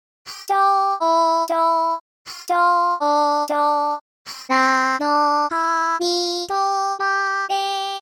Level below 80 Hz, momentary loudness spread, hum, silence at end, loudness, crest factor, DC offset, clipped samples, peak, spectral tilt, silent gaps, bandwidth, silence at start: -72 dBFS; 9 LU; none; 0 s; -19 LUFS; 14 dB; under 0.1%; under 0.1%; -6 dBFS; -1 dB/octave; 2.01-2.25 s, 4.01-4.25 s; 18.5 kHz; 0.25 s